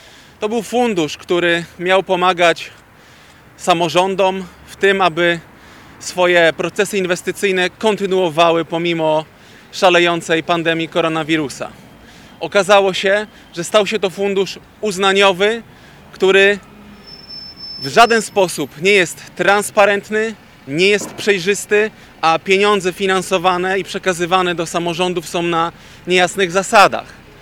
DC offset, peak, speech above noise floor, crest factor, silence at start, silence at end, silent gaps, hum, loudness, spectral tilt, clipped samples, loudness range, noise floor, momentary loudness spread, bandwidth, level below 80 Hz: under 0.1%; 0 dBFS; 29 dB; 16 dB; 0.4 s; 0.3 s; none; none; -15 LUFS; -3.5 dB/octave; under 0.1%; 2 LU; -44 dBFS; 13 LU; 17 kHz; -52 dBFS